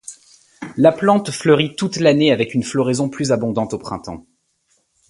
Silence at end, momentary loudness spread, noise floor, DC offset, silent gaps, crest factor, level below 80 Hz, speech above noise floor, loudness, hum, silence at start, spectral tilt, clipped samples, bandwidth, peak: 0.9 s; 17 LU; -64 dBFS; under 0.1%; none; 18 dB; -54 dBFS; 47 dB; -17 LUFS; none; 0.1 s; -5.5 dB/octave; under 0.1%; 11.5 kHz; 0 dBFS